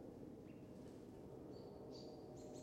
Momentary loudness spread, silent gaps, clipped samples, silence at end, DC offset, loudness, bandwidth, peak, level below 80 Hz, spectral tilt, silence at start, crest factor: 2 LU; none; under 0.1%; 0 s; under 0.1%; -57 LUFS; 16 kHz; -42 dBFS; -74 dBFS; -6.5 dB/octave; 0 s; 14 dB